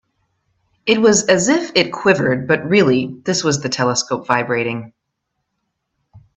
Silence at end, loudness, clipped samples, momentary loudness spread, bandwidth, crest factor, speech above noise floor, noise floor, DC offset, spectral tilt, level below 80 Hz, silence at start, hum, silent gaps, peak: 0.2 s; -16 LUFS; under 0.1%; 7 LU; 8.4 kHz; 18 dB; 59 dB; -75 dBFS; under 0.1%; -4 dB/octave; -56 dBFS; 0.85 s; none; none; 0 dBFS